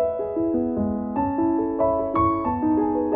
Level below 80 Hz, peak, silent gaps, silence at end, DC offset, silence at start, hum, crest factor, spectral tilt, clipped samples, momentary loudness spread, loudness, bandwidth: -44 dBFS; -10 dBFS; none; 0 s; under 0.1%; 0 s; none; 12 dB; -13 dB/octave; under 0.1%; 4 LU; -23 LUFS; 3.6 kHz